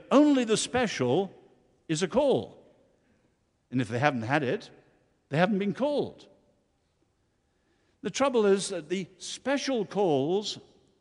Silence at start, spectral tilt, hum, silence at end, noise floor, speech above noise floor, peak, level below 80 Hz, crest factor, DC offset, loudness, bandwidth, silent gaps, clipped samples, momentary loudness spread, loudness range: 0.1 s; -5 dB/octave; none; 0.4 s; -72 dBFS; 45 dB; -6 dBFS; -66 dBFS; 24 dB; under 0.1%; -28 LUFS; 11.5 kHz; none; under 0.1%; 11 LU; 4 LU